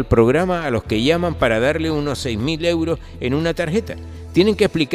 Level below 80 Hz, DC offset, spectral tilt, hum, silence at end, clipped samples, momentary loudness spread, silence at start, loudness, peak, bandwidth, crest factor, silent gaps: -36 dBFS; under 0.1%; -6 dB/octave; none; 0 s; under 0.1%; 8 LU; 0 s; -19 LUFS; 0 dBFS; 14.5 kHz; 18 dB; none